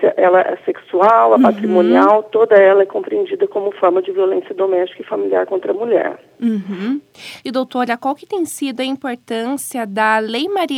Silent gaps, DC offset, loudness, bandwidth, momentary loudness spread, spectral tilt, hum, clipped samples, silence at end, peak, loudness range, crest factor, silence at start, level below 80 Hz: none; under 0.1%; -16 LUFS; 16 kHz; 11 LU; -5 dB/octave; none; under 0.1%; 0 s; 0 dBFS; 9 LU; 16 dB; 0 s; -72 dBFS